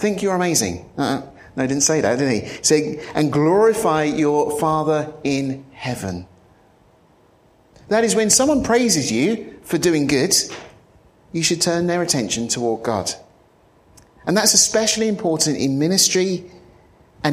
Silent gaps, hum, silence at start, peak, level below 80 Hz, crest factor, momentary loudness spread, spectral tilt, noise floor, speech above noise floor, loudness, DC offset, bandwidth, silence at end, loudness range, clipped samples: none; none; 0 s; 0 dBFS; -52 dBFS; 20 dB; 13 LU; -3.5 dB/octave; -54 dBFS; 36 dB; -18 LUFS; under 0.1%; 15.5 kHz; 0 s; 5 LU; under 0.1%